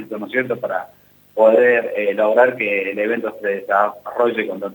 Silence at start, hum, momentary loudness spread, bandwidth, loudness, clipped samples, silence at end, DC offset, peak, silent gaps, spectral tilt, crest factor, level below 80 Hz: 0 s; 50 Hz at -60 dBFS; 9 LU; 20 kHz; -18 LUFS; under 0.1%; 0 s; under 0.1%; 0 dBFS; none; -6.5 dB/octave; 18 dB; -70 dBFS